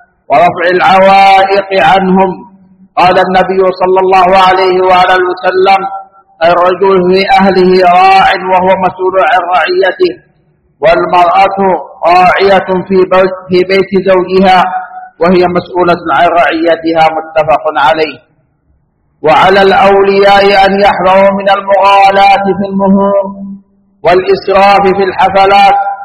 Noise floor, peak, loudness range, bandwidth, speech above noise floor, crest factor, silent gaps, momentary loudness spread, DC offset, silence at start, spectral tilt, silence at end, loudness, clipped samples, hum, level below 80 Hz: -53 dBFS; 0 dBFS; 3 LU; 10.5 kHz; 47 dB; 6 dB; none; 7 LU; under 0.1%; 0.3 s; -6 dB/octave; 0 s; -7 LUFS; 2%; none; -38 dBFS